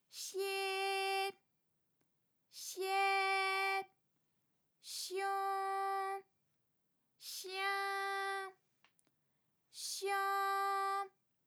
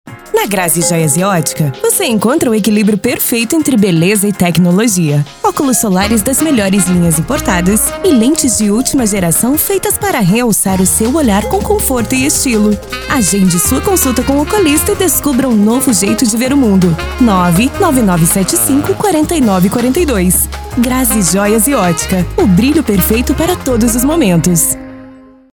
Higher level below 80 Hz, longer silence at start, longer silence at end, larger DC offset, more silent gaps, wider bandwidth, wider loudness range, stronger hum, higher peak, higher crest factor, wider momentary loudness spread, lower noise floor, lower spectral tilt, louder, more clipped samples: second, under -90 dBFS vs -28 dBFS; about the same, 0.15 s vs 0.05 s; about the same, 0.4 s vs 0.35 s; neither; neither; about the same, over 20 kHz vs over 20 kHz; first, 5 LU vs 1 LU; neither; second, -26 dBFS vs 0 dBFS; about the same, 14 dB vs 10 dB; first, 14 LU vs 3 LU; first, -82 dBFS vs -36 dBFS; second, 0.5 dB/octave vs -4.5 dB/octave; second, -38 LUFS vs -10 LUFS; neither